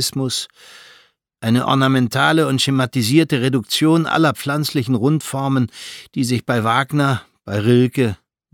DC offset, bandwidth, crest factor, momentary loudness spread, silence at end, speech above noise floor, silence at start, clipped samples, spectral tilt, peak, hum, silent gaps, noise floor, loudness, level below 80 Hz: under 0.1%; 17.5 kHz; 16 dB; 9 LU; 0.4 s; 36 dB; 0 s; under 0.1%; -5.5 dB/octave; -2 dBFS; none; none; -53 dBFS; -17 LUFS; -58 dBFS